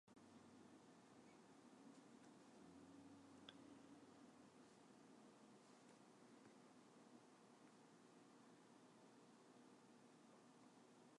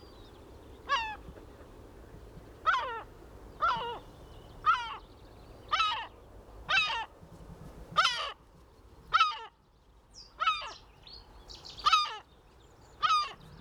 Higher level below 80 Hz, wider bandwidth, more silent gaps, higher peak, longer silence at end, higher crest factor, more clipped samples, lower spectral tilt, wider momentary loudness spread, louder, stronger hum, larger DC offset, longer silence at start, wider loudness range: second, under -90 dBFS vs -56 dBFS; second, 11 kHz vs 15 kHz; neither; second, -42 dBFS vs -14 dBFS; about the same, 0 s vs 0 s; about the same, 26 dB vs 22 dB; neither; first, -4.5 dB/octave vs -1.5 dB/octave; second, 4 LU vs 25 LU; second, -68 LUFS vs -30 LUFS; neither; neither; about the same, 0.05 s vs 0 s; about the same, 3 LU vs 4 LU